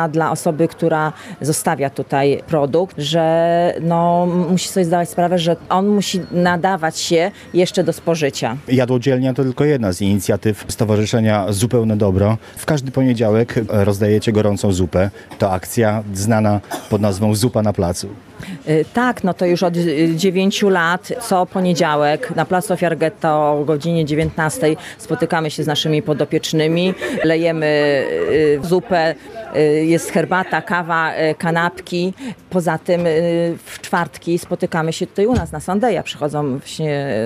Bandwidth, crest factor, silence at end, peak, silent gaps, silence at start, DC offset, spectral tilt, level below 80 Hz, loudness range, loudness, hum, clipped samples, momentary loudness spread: 15 kHz; 16 dB; 0 s; -2 dBFS; none; 0 s; under 0.1%; -5.5 dB/octave; -46 dBFS; 2 LU; -17 LUFS; none; under 0.1%; 6 LU